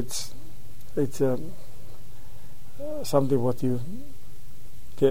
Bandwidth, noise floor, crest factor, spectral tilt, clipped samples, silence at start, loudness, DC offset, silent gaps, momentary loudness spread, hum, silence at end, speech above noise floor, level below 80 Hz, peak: 16 kHz; -47 dBFS; 22 dB; -6 dB/octave; under 0.1%; 0 s; -28 LUFS; 6%; none; 25 LU; none; 0 s; 20 dB; -50 dBFS; -6 dBFS